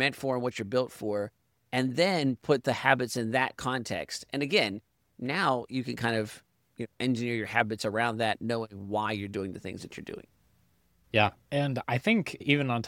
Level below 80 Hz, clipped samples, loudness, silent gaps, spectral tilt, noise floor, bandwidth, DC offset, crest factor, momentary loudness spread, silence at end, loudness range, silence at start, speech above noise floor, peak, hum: -66 dBFS; under 0.1%; -29 LUFS; none; -5 dB/octave; -68 dBFS; 16.5 kHz; under 0.1%; 24 dB; 14 LU; 0 s; 4 LU; 0 s; 39 dB; -6 dBFS; none